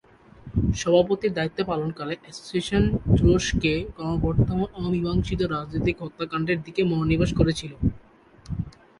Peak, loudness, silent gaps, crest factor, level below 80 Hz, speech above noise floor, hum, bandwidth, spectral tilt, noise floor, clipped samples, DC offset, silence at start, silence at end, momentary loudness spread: -4 dBFS; -25 LUFS; none; 20 dB; -36 dBFS; 29 dB; none; 11.5 kHz; -6.5 dB/octave; -52 dBFS; under 0.1%; under 0.1%; 0.45 s; 0.3 s; 10 LU